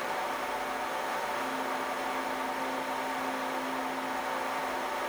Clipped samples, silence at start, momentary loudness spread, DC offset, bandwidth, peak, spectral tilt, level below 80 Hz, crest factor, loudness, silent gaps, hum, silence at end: under 0.1%; 0 s; 1 LU; under 0.1%; over 20 kHz; -20 dBFS; -2.5 dB/octave; -66 dBFS; 14 dB; -33 LUFS; none; none; 0 s